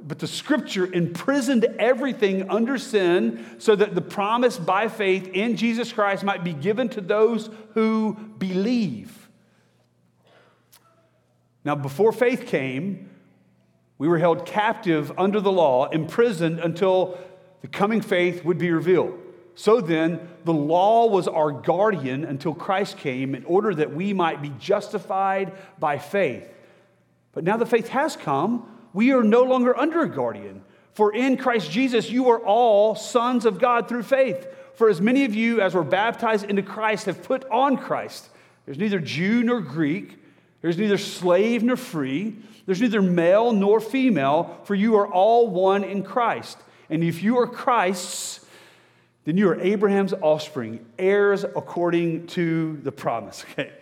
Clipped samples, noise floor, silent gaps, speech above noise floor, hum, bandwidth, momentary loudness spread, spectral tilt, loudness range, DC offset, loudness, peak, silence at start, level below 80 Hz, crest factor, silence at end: under 0.1%; -64 dBFS; none; 42 dB; none; 16 kHz; 10 LU; -6 dB/octave; 5 LU; under 0.1%; -22 LUFS; -4 dBFS; 0 s; -76 dBFS; 18 dB; 0.1 s